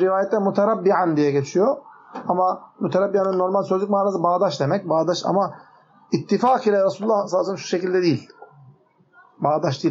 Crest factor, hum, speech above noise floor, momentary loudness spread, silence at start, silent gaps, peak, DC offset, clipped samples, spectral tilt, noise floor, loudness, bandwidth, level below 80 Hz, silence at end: 16 dB; none; 35 dB; 7 LU; 0 s; none; -4 dBFS; under 0.1%; under 0.1%; -5.5 dB/octave; -55 dBFS; -21 LUFS; 7.6 kHz; -74 dBFS; 0 s